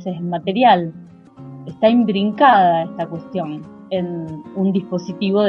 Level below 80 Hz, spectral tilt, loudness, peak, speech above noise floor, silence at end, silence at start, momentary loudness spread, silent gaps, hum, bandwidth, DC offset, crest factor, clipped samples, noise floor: -62 dBFS; -7.5 dB/octave; -17 LUFS; 0 dBFS; 22 dB; 0 s; 0 s; 16 LU; none; none; 6.4 kHz; under 0.1%; 16 dB; under 0.1%; -39 dBFS